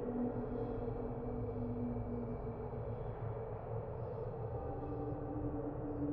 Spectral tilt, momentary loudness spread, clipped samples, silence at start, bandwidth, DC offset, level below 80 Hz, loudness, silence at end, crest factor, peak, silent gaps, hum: -11 dB/octave; 3 LU; under 0.1%; 0 s; 4.3 kHz; under 0.1%; -50 dBFS; -42 LUFS; 0 s; 12 dB; -28 dBFS; none; none